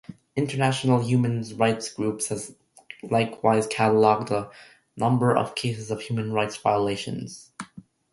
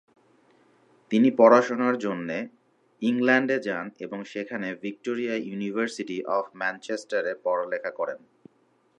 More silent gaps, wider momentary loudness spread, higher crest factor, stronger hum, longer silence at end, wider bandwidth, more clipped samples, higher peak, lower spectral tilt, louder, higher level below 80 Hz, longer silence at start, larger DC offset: neither; first, 18 LU vs 15 LU; about the same, 20 dB vs 22 dB; neither; second, 0.35 s vs 0.8 s; first, 11.5 kHz vs 9.4 kHz; neither; about the same, -4 dBFS vs -4 dBFS; about the same, -5.5 dB/octave vs -5.5 dB/octave; about the same, -24 LUFS vs -26 LUFS; first, -62 dBFS vs -80 dBFS; second, 0.1 s vs 1.1 s; neither